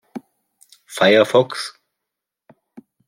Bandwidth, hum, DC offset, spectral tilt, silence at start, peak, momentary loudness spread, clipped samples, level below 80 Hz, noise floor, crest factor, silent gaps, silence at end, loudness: 16 kHz; none; under 0.1%; -4.5 dB/octave; 0.15 s; -2 dBFS; 24 LU; under 0.1%; -70 dBFS; -83 dBFS; 20 dB; none; 0.3 s; -16 LUFS